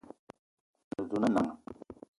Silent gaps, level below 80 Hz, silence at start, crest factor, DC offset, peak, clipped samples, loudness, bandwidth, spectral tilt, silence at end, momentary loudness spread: 0.19-0.27 s, 0.39-0.74 s, 0.84-0.91 s; -66 dBFS; 0.1 s; 22 dB; under 0.1%; -14 dBFS; under 0.1%; -32 LUFS; 11.5 kHz; -7 dB/octave; 0.25 s; 23 LU